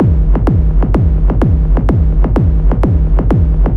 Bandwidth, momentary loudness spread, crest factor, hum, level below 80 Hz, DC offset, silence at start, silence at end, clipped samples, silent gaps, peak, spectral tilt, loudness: 3.3 kHz; 1 LU; 10 dB; none; -12 dBFS; under 0.1%; 0 s; 0 s; under 0.1%; none; 0 dBFS; -11 dB/octave; -13 LUFS